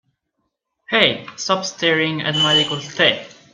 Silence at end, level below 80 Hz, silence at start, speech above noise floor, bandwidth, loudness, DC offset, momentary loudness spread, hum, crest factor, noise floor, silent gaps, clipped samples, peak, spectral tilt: 0.2 s; -62 dBFS; 0.9 s; 55 dB; 10 kHz; -17 LUFS; under 0.1%; 7 LU; none; 20 dB; -74 dBFS; none; under 0.1%; 0 dBFS; -3 dB/octave